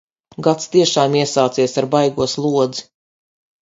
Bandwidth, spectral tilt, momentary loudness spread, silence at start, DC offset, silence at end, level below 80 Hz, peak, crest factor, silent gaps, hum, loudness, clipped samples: 7.8 kHz; -4.5 dB/octave; 5 LU; 0.4 s; under 0.1%; 0.8 s; -56 dBFS; 0 dBFS; 18 dB; none; none; -17 LUFS; under 0.1%